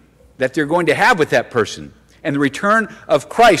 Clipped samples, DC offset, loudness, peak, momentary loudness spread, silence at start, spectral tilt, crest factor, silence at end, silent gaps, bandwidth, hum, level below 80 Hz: under 0.1%; under 0.1%; -16 LUFS; -4 dBFS; 10 LU; 0.4 s; -4.5 dB/octave; 12 dB; 0 s; none; 16 kHz; none; -48 dBFS